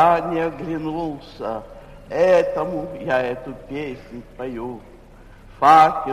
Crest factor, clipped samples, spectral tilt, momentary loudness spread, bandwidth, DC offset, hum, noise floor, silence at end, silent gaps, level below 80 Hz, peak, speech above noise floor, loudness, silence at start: 18 dB; under 0.1%; -6 dB/octave; 19 LU; 14 kHz; under 0.1%; none; -44 dBFS; 0 s; none; -46 dBFS; -2 dBFS; 24 dB; -20 LUFS; 0 s